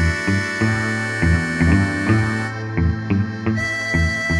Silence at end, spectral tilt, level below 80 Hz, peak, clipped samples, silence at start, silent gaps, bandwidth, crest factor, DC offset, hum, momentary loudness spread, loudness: 0 s; -6 dB/octave; -30 dBFS; -4 dBFS; under 0.1%; 0 s; none; 12 kHz; 16 dB; under 0.1%; none; 5 LU; -19 LUFS